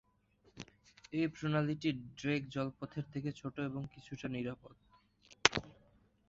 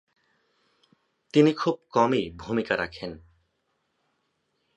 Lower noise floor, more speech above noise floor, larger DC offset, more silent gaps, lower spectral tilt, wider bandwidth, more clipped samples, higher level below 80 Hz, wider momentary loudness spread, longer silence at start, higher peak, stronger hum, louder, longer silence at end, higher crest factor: second, -71 dBFS vs -75 dBFS; second, 32 dB vs 51 dB; neither; neither; second, -4 dB/octave vs -6.5 dB/octave; about the same, 7.8 kHz vs 8.4 kHz; neither; second, -66 dBFS vs -58 dBFS; first, 18 LU vs 12 LU; second, 0.55 s vs 1.35 s; first, -2 dBFS vs -6 dBFS; neither; second, -38 LUFS vs -25 LUFS; second, 0.55 s vs 1.6 s; first, 38 dB vs 22 dB